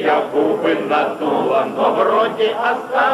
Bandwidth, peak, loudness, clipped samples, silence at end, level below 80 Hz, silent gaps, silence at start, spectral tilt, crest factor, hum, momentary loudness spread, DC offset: 13.5 kHz; -4 dBFS; -17 LUFS; under 0.1%; 0 s; -68 dBFS; none; 0 s; -5.5 dB/octave; 12 dB; none; 3 LU; under 0.1%